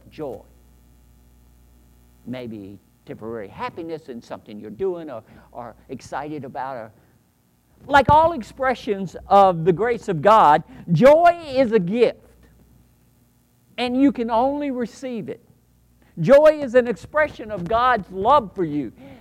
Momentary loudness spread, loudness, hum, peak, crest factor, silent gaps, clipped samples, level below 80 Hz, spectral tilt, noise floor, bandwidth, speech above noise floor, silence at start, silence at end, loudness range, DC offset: 22 LU; -19 LUFS; none; -2 dBFS; 18 dB; none; under 0.1%; -48 dBFS; -7 dB/octave; -61 dBFS; 15 kHz; 41 dB; 0.2 s; 0.05 s; 18 LU; under 0.1%